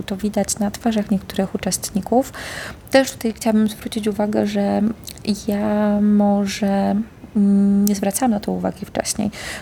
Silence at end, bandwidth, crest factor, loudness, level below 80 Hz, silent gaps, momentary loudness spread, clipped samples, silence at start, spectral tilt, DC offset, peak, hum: 0 s; 18 kHz; 18 dB; -20 LUFS; -46 dBFS; none; 8 LU; under 0.1%; 0 s; -5 dB/octave; under 0.1%; -2 dBFS; none